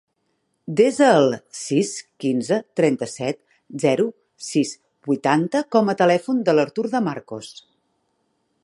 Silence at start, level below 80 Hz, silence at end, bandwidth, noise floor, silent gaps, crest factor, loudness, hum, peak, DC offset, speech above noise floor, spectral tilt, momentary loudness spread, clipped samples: 0.7 s; -70 dBFS; 1.1 s; 11.5 kHz; -71 dBFS; none; 18 dB; -21 LUFS; none; -2 dBFS; under 0.1%; 51 dB; -5.5 dB/octave; 18 LU; under 0.1%